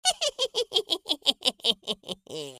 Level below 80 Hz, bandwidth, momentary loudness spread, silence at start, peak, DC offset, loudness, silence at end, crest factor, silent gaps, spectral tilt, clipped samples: -70 dBFS; 15.5 kHz; 10 LU; 0.05 s; -4 dBFS; under 0.1%; -26 LUFS; 0 s; 24 dB; none; -0.5 dB/octave; under 0.1%